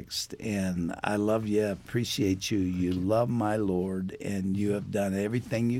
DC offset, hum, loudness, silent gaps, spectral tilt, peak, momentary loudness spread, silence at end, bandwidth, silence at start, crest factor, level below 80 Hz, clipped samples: under 0.1%; none; -29 LUFS; none; -6 dB/octave; -10 dBFS; 6 LU; 0 s; 16.5 kHz; 0 s; 18 dB; -56 dBFS; under 0.1%